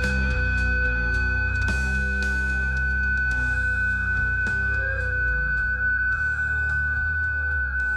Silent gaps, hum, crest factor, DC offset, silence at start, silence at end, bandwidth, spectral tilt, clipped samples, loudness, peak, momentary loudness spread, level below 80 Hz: none; none; 10 dB; under 0.1%; 0 s; 0 s; 10 kHz; -5.5 dB/octave; under 0.1%; -23 LUFS; -12 dBFS; 1 LU; -28 dBFS